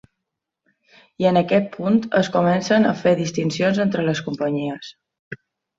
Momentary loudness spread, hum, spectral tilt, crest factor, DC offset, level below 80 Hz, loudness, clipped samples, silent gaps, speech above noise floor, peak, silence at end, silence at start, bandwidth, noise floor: 20 LU; none; -6 dB/octave; 16 dB; under 0.1%; -60 dBFS; -20 LUFS; under 0.1%; 5.19-5.31 s; 62 dB; -4 dBFS; 0.45 s; 1.2 s; 7.8 kHz; -81 dBFS